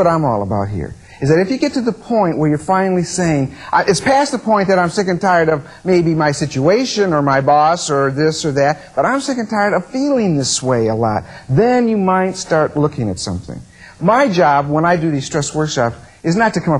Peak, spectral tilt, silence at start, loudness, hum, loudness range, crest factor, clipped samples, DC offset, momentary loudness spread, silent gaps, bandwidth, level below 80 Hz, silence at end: -2 dBFS; -5.5 dB/octave; 0 s; -15 LUFS; none; 2 LU; 14 dB; under 0.1%; under 0.1%; 7 LU; none; 11.5 kHz; -46 dBFS; 0 s